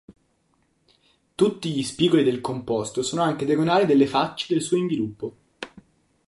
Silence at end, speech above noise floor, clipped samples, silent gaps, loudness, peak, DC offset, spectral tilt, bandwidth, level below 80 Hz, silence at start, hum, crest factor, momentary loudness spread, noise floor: 0.6 s; 45 dB; under 0.1%; none; -23 LUFS; -6 dBFS; under 0.1%; -5.5 dB/octave; 11.5 kHz; -62 dBFS; 0.1 s; none; 18 dB; 18 LU; -67 dBFS